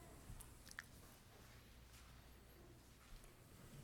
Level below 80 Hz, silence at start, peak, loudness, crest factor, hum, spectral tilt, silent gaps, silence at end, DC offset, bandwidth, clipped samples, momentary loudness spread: -66 dBFS; 0 s; -32 dBFS; -62 LUFS; 28 dB; none; -3.5 dB/octave; none; 0 s; under 0.1%; 19 kHz; under 0.1%; 8 LU